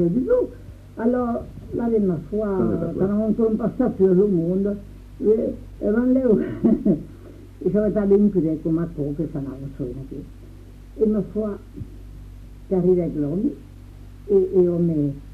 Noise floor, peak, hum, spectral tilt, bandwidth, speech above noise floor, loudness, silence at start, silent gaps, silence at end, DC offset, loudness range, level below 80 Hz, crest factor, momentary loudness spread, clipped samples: -41 dBFS; -6 dBFS; none; -11 dB/octave; 5.2 kHz; 20 dB; -22 LUFS; 0 s; none; 0 s; under 0.1%; 6 LU; -42 dBFS; 16 dB; 19 LU; under 0.1%